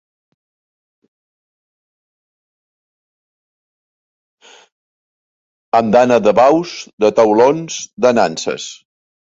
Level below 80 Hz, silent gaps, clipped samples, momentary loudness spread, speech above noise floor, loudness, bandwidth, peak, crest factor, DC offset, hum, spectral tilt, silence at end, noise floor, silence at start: -58 dBFS; 6.93-6.98 s, 7.93-7.97 s; under 0.1%; 14 LU; over 77 dB; -13 LUFS; 7.8 kHz; 0 dBFS; 16 dB; under 0.1%; none; -4.5 dB/octave; 0.55 s; under -90 dBFS; 5.75 s